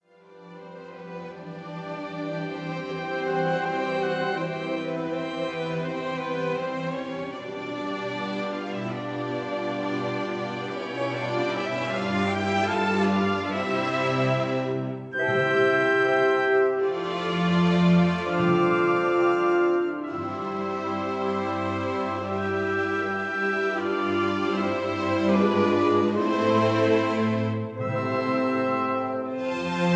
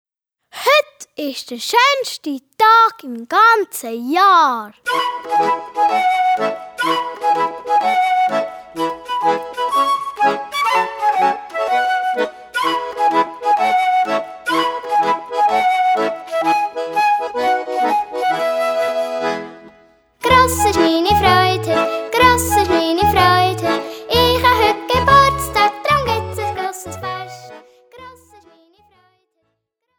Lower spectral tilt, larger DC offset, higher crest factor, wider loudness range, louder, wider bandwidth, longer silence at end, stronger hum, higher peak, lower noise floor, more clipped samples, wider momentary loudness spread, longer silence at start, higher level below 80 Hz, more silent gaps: first, -7 dB/octave vs -3.5 dB/octave; neither; about the same, 16 dB vs 16 dB; first, 8 LU vs 4 LU; second, -25 LUFS vs -16 LUFS; second, 8.6 kHz vs over 20 kHz; second, 0 s vs 1.85 s; neither; second, -10 dBFS vs 0 dBFS; second, -50 dBFS vs -71 dBFS; neither; about the same, 10 LU vs 12 LU; second, 0.3 s vs 0.55 s; second, -66 dBFS vs -40 dBFS; neither